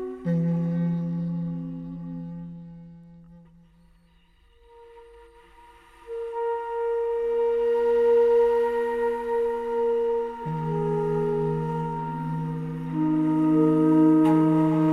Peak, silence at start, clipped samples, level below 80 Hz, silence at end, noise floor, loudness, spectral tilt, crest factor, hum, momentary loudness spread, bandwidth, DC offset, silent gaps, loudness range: -10 dBFS; 0 s; under 0.1%; -54 dBFS; 0 s; -59 dBFS; -24 LUFS; -10 dB/octave; 14 dB; none; 16 LU; 9.4 kHz; under 0.1%; none; 16 LU